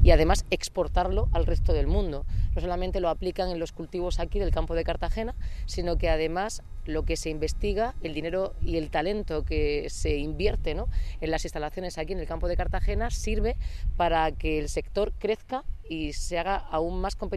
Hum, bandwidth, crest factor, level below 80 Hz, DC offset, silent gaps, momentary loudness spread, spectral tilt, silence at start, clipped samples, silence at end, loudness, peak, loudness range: none; 13 kHz; 20 dB; -30 dBFS; under 0.1%; none; 7 LU; -5.5 dB/octave; 0 s; under 0.1%; 0 s; -29 LUFS; -6 dBFS; 2 LU